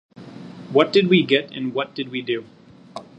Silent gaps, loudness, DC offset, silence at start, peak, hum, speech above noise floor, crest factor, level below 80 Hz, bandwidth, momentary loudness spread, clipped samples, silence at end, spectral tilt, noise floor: none; -20 LUFS; under 0.1%; 0.2 s; 0 dBFS; none; 20 dB; 22 dB; -66 dBFS; 8.4 kHz; 23 LU; under 0.1%; 0.15 s; -6.5 dB/octave; -40 dBFS